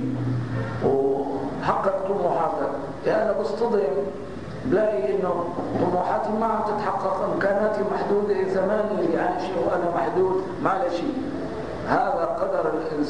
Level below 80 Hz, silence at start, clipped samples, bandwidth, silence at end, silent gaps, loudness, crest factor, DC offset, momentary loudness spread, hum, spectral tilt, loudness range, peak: -50 dBFS; 0 s; under 0.1%; 10 kHz; 0 s; none; -24 LUFS; 18 dB; 0.8%; 6 LU; none; -7.5 dB/octave; 1 LU; -6 dBFS